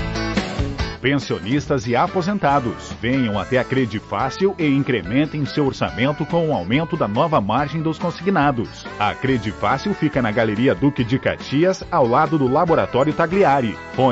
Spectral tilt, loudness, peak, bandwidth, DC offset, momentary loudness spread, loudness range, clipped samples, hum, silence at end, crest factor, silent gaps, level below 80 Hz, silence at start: -6.5 dB/octave; -20 LUFS; -6 dBFS; 8 kHz; under 0.1%; 6 LU; 2 LU; under 0.1%; none; 0 s; 14 dB; none; -40 dBFS; 0 s